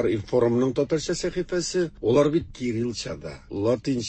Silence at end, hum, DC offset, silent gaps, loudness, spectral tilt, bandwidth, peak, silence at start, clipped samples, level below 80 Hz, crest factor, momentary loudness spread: 0 s; none; under 0.1%; none; -25 LUFS; -5.5 dB/octave; 8.8 kHz; -8 dBFS; 0 s; under 0.1%; -48 dBFS; 16 dB; 10 LU